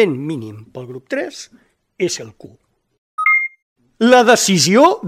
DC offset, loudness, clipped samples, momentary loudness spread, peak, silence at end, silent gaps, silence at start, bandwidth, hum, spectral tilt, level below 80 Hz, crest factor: under 0.1%; -14 LUFS; under 0.1%; 22 LU; 0 dBFS; 0 s; 2.98-3.18 s, 3.62-3.76 s; 0 s; 16.5 kHz; none; -3.5 dB/octave; -62 dBFS; 16 dB